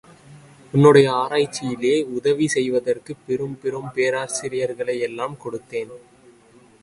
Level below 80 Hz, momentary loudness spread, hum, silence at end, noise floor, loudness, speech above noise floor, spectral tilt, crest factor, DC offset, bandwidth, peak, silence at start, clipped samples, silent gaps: -62 dBFS; 15 LU; none; 0.85 s; -52 dBFS; -21 LUFS; 31 dB; -5.5 dB/octave; 20 dB; under 0.1%; 11.5 kHz; -2 dBFS; 0.3 s; under 0.1%; none